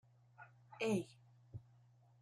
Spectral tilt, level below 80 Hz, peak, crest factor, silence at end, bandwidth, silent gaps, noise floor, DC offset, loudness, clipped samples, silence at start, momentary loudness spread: -6 dB/octave; -78 dBFS; -26 dBFS; 22 dB; 0.6 s; 14.5 kHz; none; -68 dBFS; under 0.1%; -41 LUFS; under 0.1%; 0.4 s; 22 LU